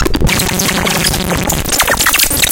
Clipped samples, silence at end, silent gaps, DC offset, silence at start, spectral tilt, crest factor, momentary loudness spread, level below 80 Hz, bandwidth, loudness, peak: under 0.1%; 0 s; none; under 0.1%; 0 s; -2.5 dB/octave; 12 dB; 5 LU; -22 dBFS; over 20 kHz; -11 LUFS; 0 dBFS